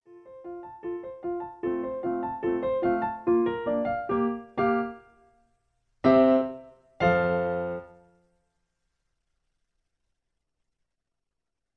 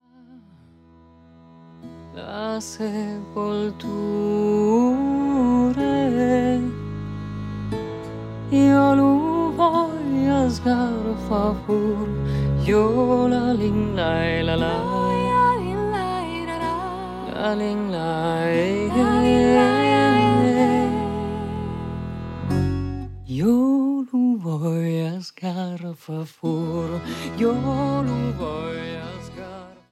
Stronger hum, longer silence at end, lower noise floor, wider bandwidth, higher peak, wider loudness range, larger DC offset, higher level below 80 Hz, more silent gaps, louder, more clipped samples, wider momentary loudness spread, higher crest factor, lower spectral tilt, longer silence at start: neither; first, 3.9 s vs 0.2 s; first, -86 dBFS vs -51 dBFS; second, 6.2 kHz vs 13 kHz; second, -10 dBFS vs -4 dBFS; about the same, 5 LU vs 7 LU; neither; second, -58 dBFS vs -42 dBFS; neither; second, -27 LUFS vs -22 LUFS; neither; about the same, 15 LU vs 14 LU; about the same, 20 dB vs 18 dB; first, -9 dB/octave vs -7 dB/octave; second, 0.1 s vs 0.3 s